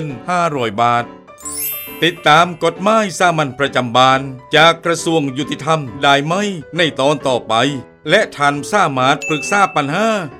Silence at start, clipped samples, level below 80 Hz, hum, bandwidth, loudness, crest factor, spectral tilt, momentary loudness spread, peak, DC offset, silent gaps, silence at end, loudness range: 0 s; under 0.1%; -54 dBFS; none; 16.5 kHz; -15 LUFS; 16 dB; -4 dB/octave; 9 LU; 0 dBFS; under 0.1%; none; 0 s; 2 LU